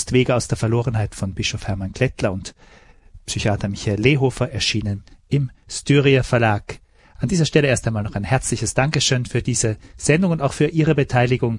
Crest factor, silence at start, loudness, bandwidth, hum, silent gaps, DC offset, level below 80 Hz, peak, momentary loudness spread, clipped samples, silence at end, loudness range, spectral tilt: 18 dB; 0 s; -20 LUFS; 11.5 kHz; none; none; under 0.1%; -40 dBFS; -2 dBFS; 10 LU; under 0.1%; 0 s; 4 LU; -5 dB/octave